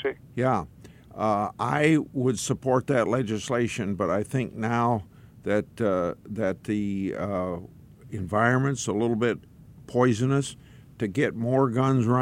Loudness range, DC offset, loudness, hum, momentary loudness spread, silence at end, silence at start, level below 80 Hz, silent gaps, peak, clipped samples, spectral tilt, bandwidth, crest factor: 3 LU; under 0.1%; -26 LUFS; none; 8 LU; 0 s; 0 s; -56 dBFS; none; -8 dBFS; under 0.1%; -6.5 dB/octave; 14 kHz; 18 dB